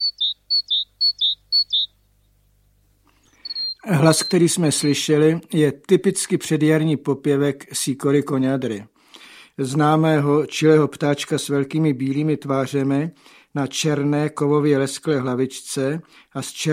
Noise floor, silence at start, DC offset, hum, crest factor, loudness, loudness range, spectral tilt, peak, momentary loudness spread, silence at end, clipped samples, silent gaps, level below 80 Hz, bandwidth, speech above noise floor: -60 dBFS; 0 s; under 0.1%; none; 20 dB; -20 LUFS; 3 LU; -5 dB/octave; -2 dBFS; 9 LU; 0 s; under 0.1%; none; -64 dBFS; 15.5 kHz; 40 dB